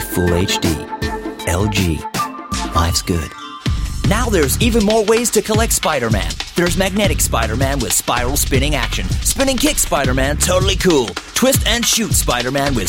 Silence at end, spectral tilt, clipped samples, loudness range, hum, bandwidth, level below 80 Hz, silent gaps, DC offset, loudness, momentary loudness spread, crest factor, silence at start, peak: 0 s; -4 dB/octave; under 0.1%; 4 LU; none; 17 kHz; -24 dBFS; none; under 0.1%; -16 LUFS; 8 LU; 14 dB; 0 s; -2 dBFS